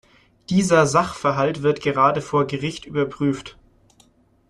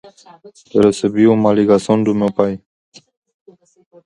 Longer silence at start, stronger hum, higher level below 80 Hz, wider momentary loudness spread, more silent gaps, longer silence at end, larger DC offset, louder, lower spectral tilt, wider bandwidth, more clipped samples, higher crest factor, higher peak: about the same, 0.5 s vs 0.45 s; neither; about the same, -54 dBFS vs -52 dBFS; about the same, 10 LU vs 8 LU; neither; second, 1 s vs 1.5 s; neither; second, -20 LUFS vs -14 LUFS; second, -5.5 dB/octave vs -7 dB/octave; about the same, 12.5 kHz vs 11.5 kHz; neither; about the same, 18 dB vs 16 dB; about the same, -2 dBFS vs 0 dBFS